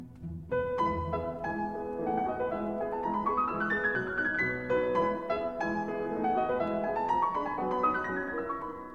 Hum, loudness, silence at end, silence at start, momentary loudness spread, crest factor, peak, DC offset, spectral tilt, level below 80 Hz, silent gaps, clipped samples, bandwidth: none; -31 LUFS; 0 s; 0 s; 6 LU; 14 dB; -16 dBFS; 0.1%; -7.5 dB/octave; -54 dBFS; none; under 0.1%; 7.6 kHz